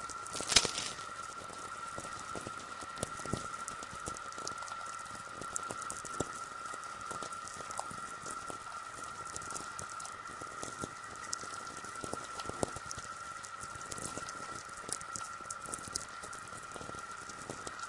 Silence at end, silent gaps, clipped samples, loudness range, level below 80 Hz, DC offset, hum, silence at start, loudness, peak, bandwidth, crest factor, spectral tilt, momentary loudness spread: 0 s; none; under 0.1%; 2 LU; -64 dBFS; under 0.1%; none; 0 s; -40 LUFS; -8 dBFS; 11.5 kHz; 32 dB; -1.5 dB/octave; 5 LU